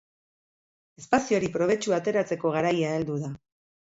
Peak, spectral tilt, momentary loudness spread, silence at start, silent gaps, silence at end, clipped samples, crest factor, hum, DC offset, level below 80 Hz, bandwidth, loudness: -6 dBFS; -5.5 dB/octave; 8 LU; 1 s; none; 0.65 s; under 0.1%; 22 dB; none; under 0.1%; -62 dBFS; 8 kHz; -26 LUFS